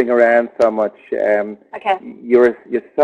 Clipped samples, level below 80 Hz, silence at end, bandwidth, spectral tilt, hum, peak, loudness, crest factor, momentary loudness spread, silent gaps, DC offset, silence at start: under 0.1%; -58 dBFS; 0 s; 8 kHz; -6.5 dB/octave; none; -2 dBFS; -16 LUFS; 14 dB; 10 LU; none; under 0.1%; 0 s